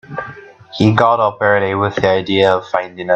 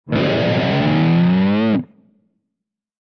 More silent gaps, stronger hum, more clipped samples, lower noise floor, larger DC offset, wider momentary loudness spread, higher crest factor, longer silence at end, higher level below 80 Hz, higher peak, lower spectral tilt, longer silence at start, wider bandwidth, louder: neither; neither; neither; second, -35 dBFS vs -81 dBFS; neither; first, 15 LU vs 5 LU; about the same, 14 dB vs 10 dB; second, 0 s vs 1.15 s; about the same, -50 dBFS vs -50 dBFS; first, 0 dBFS vs -6 dBFS; second, -6.5 dB/octave vs -8.5 dB/octave; about the same, 0.1 s vs 0.05 s; first, 8.4 kHz vs 6.2 kHz; about the same, -14 LUFS vs -16 LUFS